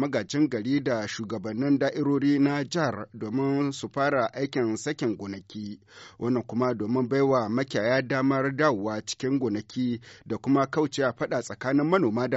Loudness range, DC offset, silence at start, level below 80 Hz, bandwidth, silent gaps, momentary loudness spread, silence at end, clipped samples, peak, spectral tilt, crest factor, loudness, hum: 3 LU; under 0.1%; 0 s; -68 dBFS; 8 kHz; none; 9 LU; 0 s; under 0.1%; -8 dBFS; -5.5 dB/octave; 18 dB; -27 LUFS; none